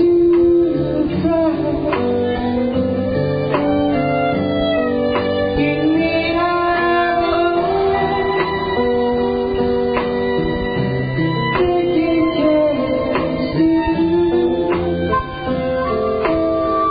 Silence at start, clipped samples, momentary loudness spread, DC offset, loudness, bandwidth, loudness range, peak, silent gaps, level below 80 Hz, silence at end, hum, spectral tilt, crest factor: 0 s; under 0.1%; 4 LU; 0.3%; -17 LUFS; 5 kHz; 2 LU; -4 dBFS; none; -36 dBFS; 0 s; none; -12 dB/octave; 12 dB